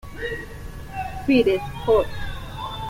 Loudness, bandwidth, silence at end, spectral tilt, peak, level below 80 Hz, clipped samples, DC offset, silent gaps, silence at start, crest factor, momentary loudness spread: -23 LUFS; 16.5 kHz; 0 s; -6.5 dB/octave; -6 dBFS; -38 dBFS; under 0.1%; under 0.1%; none; 0.05 s; 18 dB; 16 LU